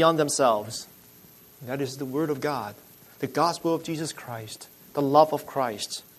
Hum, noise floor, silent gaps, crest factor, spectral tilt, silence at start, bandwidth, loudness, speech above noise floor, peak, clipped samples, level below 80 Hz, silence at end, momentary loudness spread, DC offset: none; -52 dBFS; none; 22 dB; -4.5 dB/octave; 0 s; 13.5 kHz; -26 LUFS; 26 dB; -6 dBFS; under 0.1%; -70 dBFS; 0.15 s; 16 LU; under 0.1%